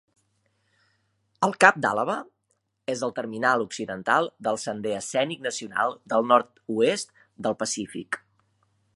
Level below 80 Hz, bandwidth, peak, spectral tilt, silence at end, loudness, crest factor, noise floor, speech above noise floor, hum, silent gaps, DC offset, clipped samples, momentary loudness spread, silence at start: -72 dBFS; 11.5 kHz; 0 dBFS; -3.5 dB/octave; 0.8 s; -25 LUFS; 26 dB; -74 dBFS; 49 dB; none; none; under 0.1%; under 0.1%; 13 LU; 1.4 s